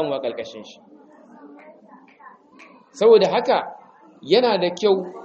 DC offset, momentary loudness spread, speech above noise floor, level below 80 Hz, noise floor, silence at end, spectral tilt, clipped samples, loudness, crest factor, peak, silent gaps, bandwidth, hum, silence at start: under 0.1%; 21 LU; 29 dB; -70 dBFS; -49 dBFS; 0 s; -5 dB/octave; under 0.1%; -19 LUFS; 18 dB; -2 dBFS; none; 7.8 kHz; none; 0 s